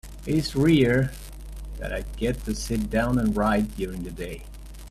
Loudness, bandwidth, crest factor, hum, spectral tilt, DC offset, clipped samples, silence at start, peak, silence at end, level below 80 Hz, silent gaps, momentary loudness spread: -25 LUFS; 15 kHz; 18 dB; none; -6 dB/octave; under 0.1%; under 0.1%; 0.05 s; -8 dBFS; 0 s; -36 dBFS; none; 21 LU